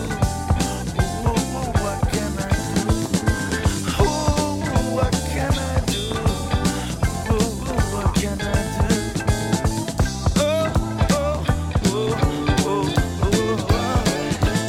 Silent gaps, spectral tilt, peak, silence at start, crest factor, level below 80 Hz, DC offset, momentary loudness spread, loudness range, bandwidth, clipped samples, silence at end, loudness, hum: none; -5 dB/octave; -4 dBFS; 0 s; 16 dB; -28 dBFS; under 0.1%; 3 LU; 1 LU; 16.5 kHz; under 0.1%; 0 s; -22 LUFS; none